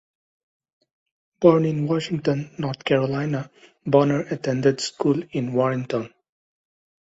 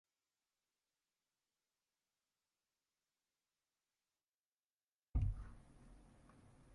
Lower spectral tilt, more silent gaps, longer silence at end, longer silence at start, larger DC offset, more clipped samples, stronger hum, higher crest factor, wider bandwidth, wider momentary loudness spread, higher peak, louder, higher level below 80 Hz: second, -6.5 dB/octave vs -8.5 dB/octave; neither; first, 0.95 s vs 0.75 s; second, 1.4 s vs 5.15 s; neither; neither; neither; about the same, 20 dB vs 24 dB; second, 8 kHz vs 11 kHz; second, 11 LU vs 24 LU; first, -2 dBFS vs -28 dBFS; first, -22 LUFS vs -45 LUFS; second, -62 dBFS vs -54 dBFS